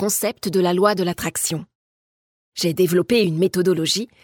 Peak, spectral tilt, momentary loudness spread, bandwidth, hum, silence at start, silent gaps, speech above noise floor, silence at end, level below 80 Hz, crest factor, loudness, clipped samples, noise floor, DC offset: -2 dBFS; -4.5 dB/octave; 7 LU; 19 kHz; none; 0 s; 1.75-2.52 s; over 70 dB; 0.2 s; -58 dBFS; 18 dB; -20 LUFS; under 0.1%; under -90 dBFS; under 0.1%